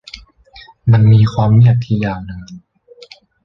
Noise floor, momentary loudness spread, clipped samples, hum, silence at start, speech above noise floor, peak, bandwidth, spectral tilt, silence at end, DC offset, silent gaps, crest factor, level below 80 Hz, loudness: -43 dBFS; 21 LU; under 0.1%; none; 0.15 s; 32 dB; -2 dBFS; 6 kHz; -9 dB/octave; 0.85 s; under 0.1%; none; 12 dB; -40 dBFS; -12 LUFS